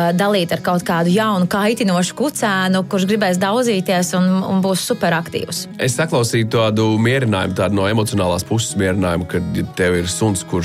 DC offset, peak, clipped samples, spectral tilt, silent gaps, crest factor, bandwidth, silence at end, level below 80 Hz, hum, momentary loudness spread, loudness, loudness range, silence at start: under 0.1%; -4 dBFS; under 0.1%; -5 dB/octave; none; 12 dB; 16 kHz; 0 s; -48 dBFS; none; 4 LU; -17 LUFS; 1 LU; 0 s